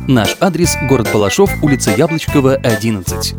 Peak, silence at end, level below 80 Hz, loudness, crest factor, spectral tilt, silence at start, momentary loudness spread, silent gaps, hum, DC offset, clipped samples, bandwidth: 0 dBFS; 0 s; -30 dBFS; -13 LUFS; 12 dB; -5 dB/octave; 0 s; 3 LU; none; none; under 0.1%; under 0.1%; over 20 kHz